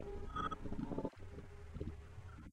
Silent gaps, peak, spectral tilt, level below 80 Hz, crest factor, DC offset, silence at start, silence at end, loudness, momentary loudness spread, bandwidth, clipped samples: none; -28 dBFS; -7.5 dB/octave; -52 dBFS; 18 dB; under 0.1%; 0 s; 0 s; -47 LUFS; 11 LU; 10.5 kHz; under 0.1%